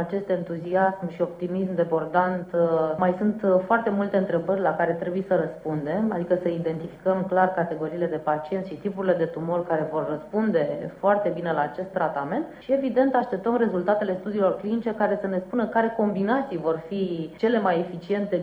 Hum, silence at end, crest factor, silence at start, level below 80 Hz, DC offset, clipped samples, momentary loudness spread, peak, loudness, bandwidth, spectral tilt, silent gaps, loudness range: none; 0 s; 18 dB; 0 s; -62 dBFS; under 0.1%; under 0.1%; 6 LU; -6 dBFS; -25 LUFS; 5.6 kHz; -9 dB/octave; none; 2 LU